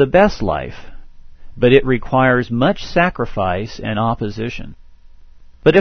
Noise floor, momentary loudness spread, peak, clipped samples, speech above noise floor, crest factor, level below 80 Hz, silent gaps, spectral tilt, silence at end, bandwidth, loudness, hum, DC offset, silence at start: -40 dBFS; 11 LU; 0 dBFS; under 0.1%; 24 dB; 16 dB; -34 dBFS; none; -7 dB/octave; 0 s; 6.4 kHz; -17 LUFS; none; 0.3%; 0 s